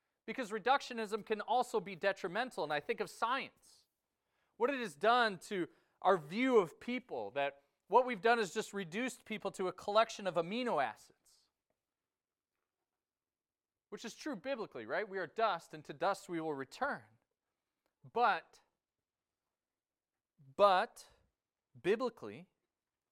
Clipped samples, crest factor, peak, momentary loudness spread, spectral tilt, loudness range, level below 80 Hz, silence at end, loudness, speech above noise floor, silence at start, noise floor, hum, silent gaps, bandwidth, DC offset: under 0.1%; 22 dB; -16 dBFS; 12 LU; -4 dB/octave; 8 LU; -82 dBFS; 0.65 s; -36 LUFS; over 54 dB; 0.25 s; under -90 dBFS; none; none; 16 kHz; under 0.1%